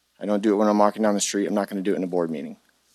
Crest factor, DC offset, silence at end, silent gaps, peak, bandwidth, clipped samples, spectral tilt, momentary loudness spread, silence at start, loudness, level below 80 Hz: 20 dB; under 0.1%; 0.4 s; none; -4 dBFS; 14 kHz; under 0.1%; -4.5 dB/octave; 9 LU; 0.2 s; -23 LUFS; -70 dBFS